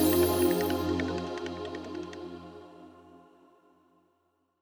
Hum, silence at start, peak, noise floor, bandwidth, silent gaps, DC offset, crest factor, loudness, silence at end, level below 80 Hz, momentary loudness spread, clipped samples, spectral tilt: none; 0 s; -14 dBFS; -74 dBFS; over 20 kHz; none; under 0.1%; 18 dB; -30 LUFS; 1.45 s; -54 dBFS; 25 LU; under 0.1%; -5 dB/octave